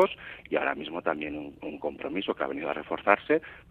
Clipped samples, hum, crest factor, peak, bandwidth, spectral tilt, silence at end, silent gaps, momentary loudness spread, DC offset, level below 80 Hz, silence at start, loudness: under 0.1%; none; 26 dB; -4 dBFS; 7.6 kHz; -6.5 dB/octave; 0.1 s; none; 11 LU; under 0.1%; -62 dBFS; 0 s; -30 LUFS